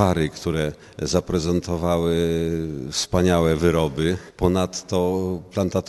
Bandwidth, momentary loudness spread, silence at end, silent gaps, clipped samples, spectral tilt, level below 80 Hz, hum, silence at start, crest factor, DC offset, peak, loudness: 12 kHz; 7 LU; 0 s; none; under 0.1%; -5.5 dB/octave; -42 dBFS; none; 0 s; 20 dB; under 0.1%; -2 dBFS; -22 LUFS